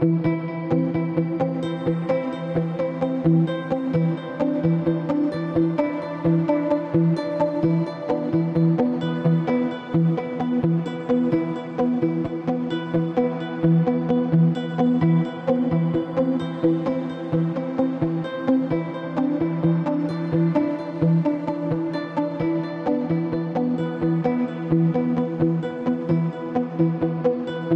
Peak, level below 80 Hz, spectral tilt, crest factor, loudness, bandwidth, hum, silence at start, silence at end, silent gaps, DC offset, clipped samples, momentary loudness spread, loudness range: -8 dBFS; -56 dBFS; -10 dB/octave; 14 dB; -23 LUFS; 5.4 kHz; none; 0 s; 0 s; none; under 0.1%; under 0.1%; 5 LU; 2 LU